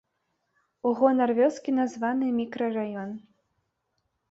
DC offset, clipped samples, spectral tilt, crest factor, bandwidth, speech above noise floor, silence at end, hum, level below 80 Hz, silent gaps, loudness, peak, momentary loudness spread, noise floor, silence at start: under 0.1%; under 0.1%; -6.5 dB/octave; 20 dB; 7.8 kHz; 52 dB; 1.15 s; none; -74 dBFS; none; -26 LUFS; -8 dBFS; 12 LU; -78 dBFS; 0.85 s